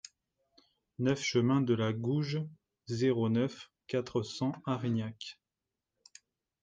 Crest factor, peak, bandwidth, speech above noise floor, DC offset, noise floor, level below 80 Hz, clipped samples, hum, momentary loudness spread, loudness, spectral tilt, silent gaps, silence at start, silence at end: 18 dB; -16 dBFS; 9.2 kHz; 58 dB; under 0.1%; -90 dBFS; -72 dBFS; under 0.1%; none; 17 LU; -33 LUFS; -6.5 dB/octave; none; 1 s; 1.3 s